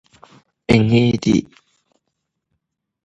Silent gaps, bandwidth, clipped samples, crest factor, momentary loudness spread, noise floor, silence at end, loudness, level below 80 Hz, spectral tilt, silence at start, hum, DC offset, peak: none; 9.6 kHz; under 0.1%; 20 dB; 6 LU; -76 dBFS; 1.6 s; -16 LUFS; -46 dBFS; -7 dB/octave; 0.7 s; none; under 0.1%; 0 dBFS